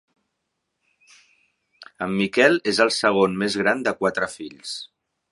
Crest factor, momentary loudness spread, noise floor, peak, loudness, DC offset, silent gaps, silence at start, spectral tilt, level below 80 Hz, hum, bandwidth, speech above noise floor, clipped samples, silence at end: 22 dB; 15 LU; -78 dBFS; 0 dBFS; -21 LUFS; under 0.1%; none; 1.8 s; -4 dB/octave; -62 dBFS; none; 11.5 kHz; 57 dB; under 0.1%; 0.45 s